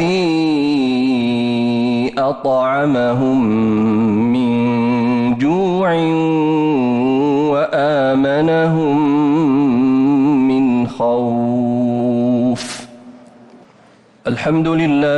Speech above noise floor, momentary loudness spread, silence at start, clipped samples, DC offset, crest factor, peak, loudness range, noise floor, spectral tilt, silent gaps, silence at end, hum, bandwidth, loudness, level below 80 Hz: 33 dB; 3 LU; 0 s; under 0.1%; under 0.1%; 8 dB; -6 dBFS; 5 LU; -47 dBFS; -7.5 dB/octave; none; 0 s; none; 11 kHz; -15 LUFS; -52 dBFS